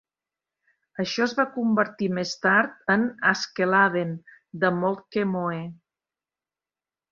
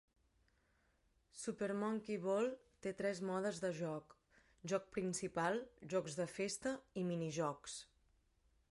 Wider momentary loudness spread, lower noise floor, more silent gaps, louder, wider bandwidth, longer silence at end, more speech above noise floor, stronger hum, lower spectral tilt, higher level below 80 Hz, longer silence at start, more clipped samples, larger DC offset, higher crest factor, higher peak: first, 12 LU vs 9 LU; first, under -90 dBFS vs -78 dBFS; neither; first, -24 LUFS vs -42 LUFS; second, 7.6 kHz vs 11.5 kHz; first, 1.4 s vs 0.9 s; first, over 66 dB vs 36 dB; neither; about the same, -5.5 dB/octave vs -5 dB/octave; first, -70 dBFS vs -76 dBFS; second, 1 s vs 1.35 s; neither; neither; about the same, 20 dB vs 20 dB; first, -6 dBFS vs -24 dBFS